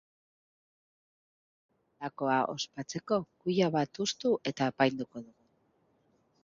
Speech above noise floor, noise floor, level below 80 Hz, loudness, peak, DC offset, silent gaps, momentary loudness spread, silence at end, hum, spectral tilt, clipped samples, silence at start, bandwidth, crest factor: 40 dB; -72 dBFS; -74 dBFS; -31 LUFS; -12 dBFS; under 0.1%; none; 13 LU; 1.2 s; none; -5 dB/octave; under 0.1%; 2 s; 7.6 kHz; 22 dB